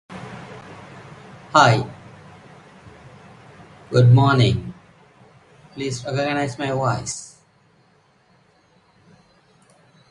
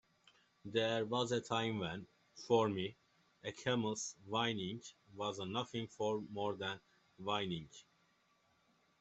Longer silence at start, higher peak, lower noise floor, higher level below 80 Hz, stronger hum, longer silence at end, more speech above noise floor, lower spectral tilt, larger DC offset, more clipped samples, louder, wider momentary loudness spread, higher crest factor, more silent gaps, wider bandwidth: second, 0.1 s vs 0.65 s; first, 0 dBFS vs -18 dBFS; second, -58 dBFS vs -76 dBFS; first, -50 dBFS vs -76 dBFS; neither; first, 2.85 s vs 1.2 s; first, 41 dB vs 36 dB; first, -6 dB/octave vs -4.5 dB/octave; neither; neither; first, -19 LUFS vs -39 LUFS; first, 27 LU vs 15 LU; about the same, 22 dB vs 22 dB; neither; first, 11 kHz vs 8.2 kHz